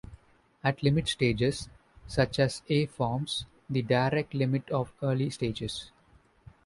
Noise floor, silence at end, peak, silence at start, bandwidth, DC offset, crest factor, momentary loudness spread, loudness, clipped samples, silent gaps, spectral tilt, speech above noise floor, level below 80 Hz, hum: -62 dBFS; 0.8 s; -12 dBFS; 0.1 s; 11.5 kHz; under 0.1%; 18 dB; 9 LU; -29 LUFS; under 0.1%; none; -6 dB/octave; 34 dB; -52 dBFS; none